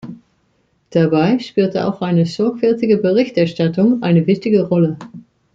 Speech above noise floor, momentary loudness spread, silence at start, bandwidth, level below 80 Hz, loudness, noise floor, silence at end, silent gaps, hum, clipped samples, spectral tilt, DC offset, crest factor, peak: 47 dB; 5 LU; 0.05 s; 7.6 kHz; -58 dBFS; -16 LUFS; -61 dBFS; 0.35 s; none; none; under 0.1%; -8.5 dB/octave; under 0.1%; 14 dB; -2 dBFS